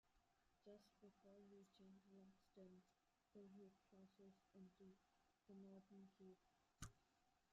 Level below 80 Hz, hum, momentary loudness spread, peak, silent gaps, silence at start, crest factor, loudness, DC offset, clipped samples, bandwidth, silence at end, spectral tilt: -82 dBFS; none; 6 LU; -40 dBFS; none; 0.05 s; 28 dB; -67 LUFS; under 0.1%; under 0.1%; 7.4 kHz; 0 s; -6 dB/octave